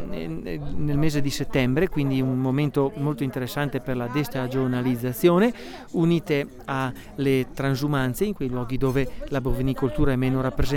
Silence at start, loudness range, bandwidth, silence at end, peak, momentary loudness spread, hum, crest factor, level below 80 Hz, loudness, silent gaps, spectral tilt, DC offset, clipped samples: 0 s; 2 LU; 18.5 kHz; 0 s; -8 dBFS; 7 LU; none; 16 dB; -38 dBFS; -25 LUFS; none; -7 dB/octave; under 0.1%; under 0.1%